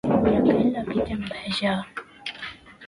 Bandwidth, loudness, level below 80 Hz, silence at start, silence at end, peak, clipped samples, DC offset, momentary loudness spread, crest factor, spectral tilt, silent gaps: 11 kHz; -24 LUFS; -46 dBFS; 0.05 s; 0 s; -6 dBFS; under 0.1%; under 0.1%; 17 LU; 18 dB; -6.5 dB/octave; none